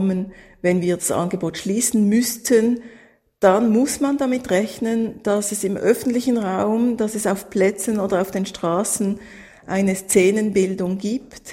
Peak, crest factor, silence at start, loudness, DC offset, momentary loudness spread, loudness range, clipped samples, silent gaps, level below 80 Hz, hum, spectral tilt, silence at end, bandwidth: -2 dBFS; 18 dB; 0 s; -20 LUFS; under 0.1%; 8 LU; 2 LU; under 0.1%; none; -56 dBFS; none; -5 dB/octave; 0 s; 16.5 kHz